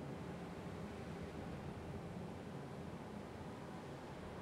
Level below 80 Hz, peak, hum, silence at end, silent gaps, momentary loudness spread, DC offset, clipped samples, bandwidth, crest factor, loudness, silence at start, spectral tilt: -64 dBFS; -36 dBFS; none; 0 s; none; 2 LU; under 0.1%; under 0.1%; 15.5 kHz; 12 dB; -50 LUFS; 0 s; -6.5 dB/octave